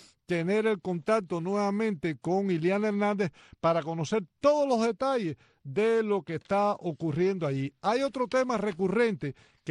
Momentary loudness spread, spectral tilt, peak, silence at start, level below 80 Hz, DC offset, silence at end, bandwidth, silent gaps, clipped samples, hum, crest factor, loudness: 6 LU; -6.5 dB/octave; -12 dBFS; 0.3 s; -66 dBFS; under 0.1%; 0 s; 11 kHz; none; under 0.1%; none; 16 dB; -29 LUFS